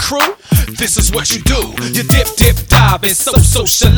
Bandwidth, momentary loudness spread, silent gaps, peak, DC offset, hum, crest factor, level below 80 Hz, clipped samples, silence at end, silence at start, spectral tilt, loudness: over 20 kHz; 5 LU; none; 0 dBFS; under 0.1%; none; 12 dB; -18 dBFS; 0.5%; 0 s; 0 s; -3.5 dB/octave; -11 LUFS